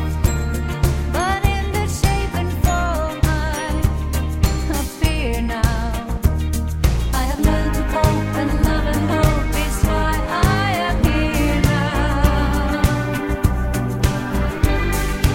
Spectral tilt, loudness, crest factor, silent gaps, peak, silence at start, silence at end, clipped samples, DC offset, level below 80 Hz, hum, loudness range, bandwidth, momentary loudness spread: -5.5 dB/octave; -20 LUFS; 14 dB; none; -4 dBFS; 0 s; 0 s; under 0.1%; under 0.1%; -22 dBFS; none; 2 LU; 17 kHz; 4 LU